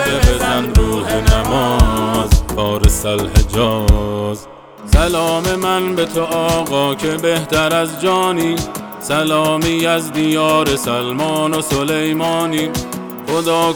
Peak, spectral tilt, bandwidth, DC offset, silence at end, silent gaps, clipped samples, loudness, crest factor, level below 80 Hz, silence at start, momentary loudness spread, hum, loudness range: 0 dBFS; -5 dB/octave; over 20 kHz; under 0.1%; 0 s; none; under 0.1%; -16 LUFS; 14 dB; -20 dBFS; 0 s; 5 LU; none; 2 LU